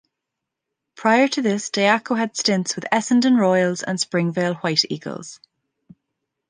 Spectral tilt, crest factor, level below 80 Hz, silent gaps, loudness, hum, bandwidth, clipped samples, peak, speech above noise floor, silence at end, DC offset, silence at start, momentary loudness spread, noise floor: -4 dB/octave; 18 dB; -70 dBFS; none; -20 LUFS; none; 10 kHz; under 0.1%; -2 dBFS; 63 dB; 1.15 s; under 0.1%; 1 s; 8 LU; -83 dBFS